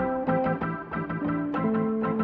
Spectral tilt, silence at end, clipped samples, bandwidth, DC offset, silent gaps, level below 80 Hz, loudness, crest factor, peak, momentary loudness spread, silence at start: -11 dB/octave; 0 s; under 0.1%; 4.9 kHz; under 0.1%; none; -54 dBFS; -28 LUFS; 14 dB; -14 dBFS; 5 LU; 0 s